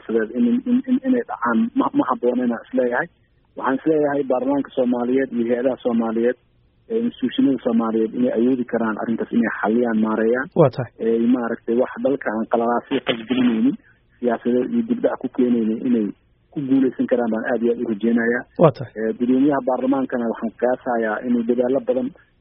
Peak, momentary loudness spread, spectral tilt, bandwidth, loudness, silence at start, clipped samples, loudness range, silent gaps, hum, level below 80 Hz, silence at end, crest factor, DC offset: 0 dBFS; 6 LU; -3.5 dB/octave; 3.9 kHz; -20 LUFS; 0.1 s; under 0.1%; 2 LU; none; none; -60 dBFS; 0.3 s; 20 dB; under 0.1%